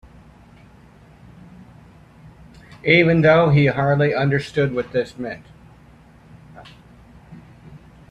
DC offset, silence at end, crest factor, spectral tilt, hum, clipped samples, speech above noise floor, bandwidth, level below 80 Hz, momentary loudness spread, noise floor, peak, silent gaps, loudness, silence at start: under 0.1%; 0.35 s; 20 dB; -8 dB/octave; none; under 0.1%; 31 dB; 8.4 kHz; -50 dBFS; 16 LU; -48 dBFS; -2 dBFS; none; -18 LUFS; 2.85 s